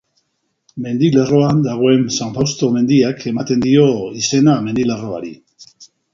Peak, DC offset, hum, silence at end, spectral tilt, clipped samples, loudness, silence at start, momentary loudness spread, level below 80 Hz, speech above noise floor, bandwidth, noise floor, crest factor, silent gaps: 0 dBFS; under 0.1%; none; 0.3 s; -6 dB/octave; under 0.1%; -15 LUFS; 0.75 s; 11 LU; -50 dBFS; 54 dB; 7.6 kHz; -68 dBFS; 16 dB; none